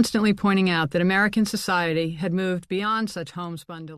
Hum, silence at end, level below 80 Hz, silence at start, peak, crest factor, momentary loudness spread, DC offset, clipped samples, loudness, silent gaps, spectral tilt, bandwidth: none; 0 s; -56 dBFS; 0 s; -8 dBFS; 16 dB; 12 LU; under 0.1%; under 0.1%; -23 LUFS; none; -5.5 dB/octave; 14 kHz